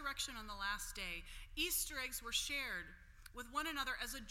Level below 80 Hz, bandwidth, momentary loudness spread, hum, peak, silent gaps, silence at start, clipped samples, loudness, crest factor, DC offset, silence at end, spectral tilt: -56 dBFS; 16.5 kHz; 12 LU; none; -26 dBFS; none; 0 s; under 0.1%; -42 LUFS; 18 dB; under 0.1%; 0 s; -0.5 dB/octave